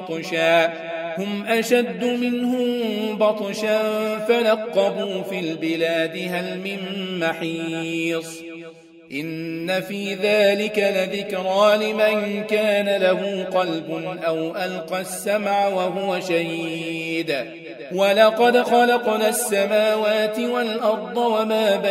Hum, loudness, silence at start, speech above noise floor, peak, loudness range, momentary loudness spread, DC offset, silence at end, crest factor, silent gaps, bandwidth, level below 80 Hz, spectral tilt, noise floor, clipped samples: none; -21 LUFS; 0 s; 22 dB; -2 dBFS; 6 LU; 10 LU; under 0.1%; 0 s; 18 dB; none; 16 kHz; -72 dBFS; -4 dB/octave; -42 dBFS; under 0.1%